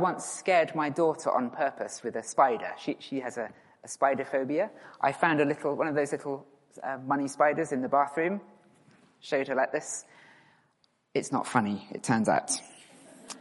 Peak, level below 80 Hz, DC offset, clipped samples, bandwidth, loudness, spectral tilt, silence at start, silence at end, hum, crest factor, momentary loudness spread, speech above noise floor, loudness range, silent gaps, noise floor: -8 dBFS; -76 dBFS; under 0.1%; under 0.1%; 11.5 kHz; -29 LUFS; -4.5 dB/octave; 0 s; 0 s; none; 22 dB; 12 LU; 42 dB; 4 LU; none; -71 dBFS